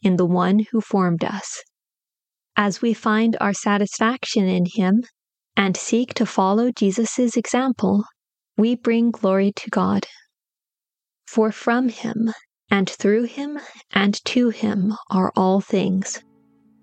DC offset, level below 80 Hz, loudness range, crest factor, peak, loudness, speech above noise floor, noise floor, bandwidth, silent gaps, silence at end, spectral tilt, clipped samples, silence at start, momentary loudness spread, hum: under 0.1%; -68 dBFS; 2 LU; 20 dB; 0 dBFS; -21 LUFS; over 70 dB; under -90 dBFS; 9 kHz; none; 0.65 s; -5.5 dB/octave; under 0.1%; 0.05 s; 7 LU; none